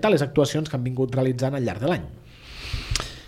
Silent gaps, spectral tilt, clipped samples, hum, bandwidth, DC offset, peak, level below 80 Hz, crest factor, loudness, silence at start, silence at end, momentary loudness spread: none; -6 dB/octave; under 0.1%; none; 15.5 kHz; under 0.1%; 0 dBFS; -40 dBFS; 24 dB; -25 LUFS; 0 s; 0 s; 17 LU